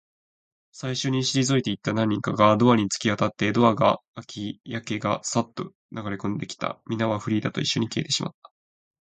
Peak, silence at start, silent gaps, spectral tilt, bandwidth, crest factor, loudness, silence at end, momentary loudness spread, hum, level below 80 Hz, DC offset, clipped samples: -4 dBFS; 0.75 s; 4.08-4.14 s, 5.75-5.89 s; -5 dB/octave; 9.4 kHz; 22 dB; -24 LUFS; 0.8 s; 15 LU; none; -60 dBFS; under 0.1%; under 0.1%